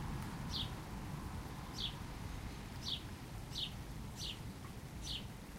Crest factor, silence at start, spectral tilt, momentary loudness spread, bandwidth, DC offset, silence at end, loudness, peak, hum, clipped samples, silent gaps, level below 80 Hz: 18 dB; 0 s; -4 dB/octave; 7 LU; 16 kHz; under 0.1%; 0 s; -45 LUFS; -28 dBFS; none; under 0.1%; none; -52 dBFS